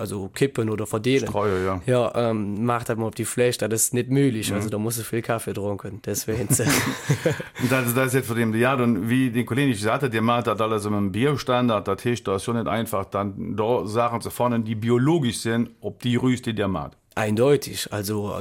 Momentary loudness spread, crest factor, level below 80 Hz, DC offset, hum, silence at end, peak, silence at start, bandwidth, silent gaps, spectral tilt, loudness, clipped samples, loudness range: 7 LU; 16 dB; -54 dBFS; under 0.1%; none; 0 s; -8 dBFS; 0 s; 17 kHz; none; -5 dB/octave; -23 LUFS; under 0.1%; 2 LU